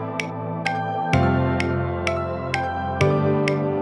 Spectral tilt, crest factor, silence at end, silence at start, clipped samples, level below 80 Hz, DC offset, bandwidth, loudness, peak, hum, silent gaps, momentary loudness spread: -7 dB/octave; 18 dB; 0 s; 0 s; under 0.1%; -46 dBFS; under 0.1%; 11.5 kHz; -23 LUFS; -4 dBFS; none; none; 7 LU